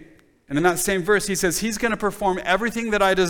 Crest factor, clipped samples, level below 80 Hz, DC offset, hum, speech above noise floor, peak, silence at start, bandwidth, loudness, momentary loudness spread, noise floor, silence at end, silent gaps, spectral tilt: 16 dB; under 0.1%; -44 dBFS; under 0.1%; none; 29 dB; -6 dBFS; 0 s; 19.5 kHz; -21 LUFS; 4 LU; -50 dBFS; 0 s; none; -3.5 dB/octave